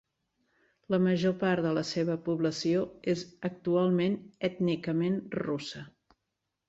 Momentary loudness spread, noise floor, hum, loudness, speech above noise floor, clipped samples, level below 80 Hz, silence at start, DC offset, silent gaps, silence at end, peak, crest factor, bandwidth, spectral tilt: 8 LU; -84 dBFS; none; -30 LUFS; 55 dB; under 0.1%; -68 dBFS; 0.9 s; under 0.1%; none; 0.8 s; -16 dBFS; 16 dB; 8 kHz; -6.5 dB/octave